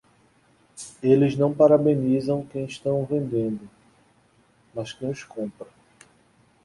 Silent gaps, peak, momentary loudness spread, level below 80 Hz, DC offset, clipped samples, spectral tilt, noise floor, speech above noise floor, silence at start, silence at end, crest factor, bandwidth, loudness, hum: none; -4 dBFS; 20 LU; -62 dBFS; under 0.1%; under 0.1%; -7.5 dB/octave; -61 dBFS; 38 dB; 0.75 s; 1 s; 20 dB; 11.5 kHz; -23 LUFS; none